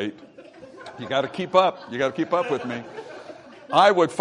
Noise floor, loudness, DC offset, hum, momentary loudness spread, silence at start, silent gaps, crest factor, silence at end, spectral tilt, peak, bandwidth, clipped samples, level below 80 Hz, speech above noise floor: -45 dBFS; -22 LUFS; under 0.1%; none; 23 LU; 0 s; none; 20 dB; 0 s; -5 dB/octave; -2 dBFS; 11 kHz; under 0.1%; -70 dBFS; 23 dB